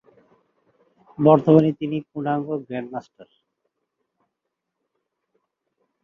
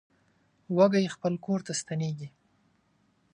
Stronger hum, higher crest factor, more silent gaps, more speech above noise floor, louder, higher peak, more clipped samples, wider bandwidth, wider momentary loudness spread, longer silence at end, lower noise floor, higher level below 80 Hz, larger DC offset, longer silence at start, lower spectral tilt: neither; about the same, 22 dB vs 22 dB; neither; first, 61 dB vs 42 dB; first, -20 LUFS vs -28 LUFS; first, -2 dBFS vs -8 dBFS; neither; second, 6 kHz vs 10.5 kHz; first, 16 LU vs 13 LU; first, 2.8 s vs 1.05 s; first, -81 dBFS vs -69 dBFS; first, -66 dBFS vs -74 dBFS; neither; first, 1.2 s vs 0.7 s; first, -10 dB/octave vs -5.5 dB/octave